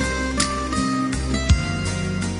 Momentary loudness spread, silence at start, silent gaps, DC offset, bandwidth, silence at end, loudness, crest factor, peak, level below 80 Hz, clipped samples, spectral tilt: 4 LU; 0 s; none; under 0.1%; 11.5 kHz; 0 s; -22 LUFS; 18 dB; -4 dBFS; -28 dBFS; under 0.1%; -4.5 dB/octave